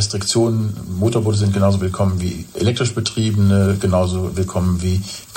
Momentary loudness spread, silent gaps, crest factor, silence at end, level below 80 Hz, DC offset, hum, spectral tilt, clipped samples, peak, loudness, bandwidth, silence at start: 6 LU; none; 14 dB; 0 s; -46 dBFS; under 0.1%; none; -6 dB/octave; under 0.1%; -2 dBFS; -18 LUFS; 16.5 kHz; 0 s